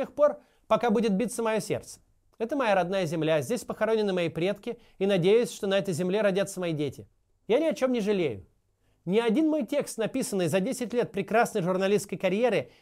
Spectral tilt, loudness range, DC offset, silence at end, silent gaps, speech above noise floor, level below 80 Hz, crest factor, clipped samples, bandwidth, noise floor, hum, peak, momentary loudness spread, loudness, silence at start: -5.5 dB/octave; 2 LU; under 0.1%; 0.15 s; none; 42 dB; -64 dBFS; 16 dB; under 0.1%; 16 kHz; -69 dBFS; none; -10 dBFS; 8 LU; -27 LUFS; 0 s